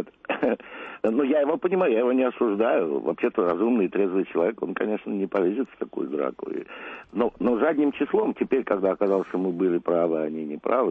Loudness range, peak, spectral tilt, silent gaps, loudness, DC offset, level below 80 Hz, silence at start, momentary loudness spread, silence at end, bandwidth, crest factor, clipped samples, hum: 4 LU; -10 dBFS; -9 dB/octave; none; -25 LUFS; under 0.1%; -64 dBFS; 0 s; 8 LU; 0 s; 4.2 kHz; 14 dB; under 0.1%; none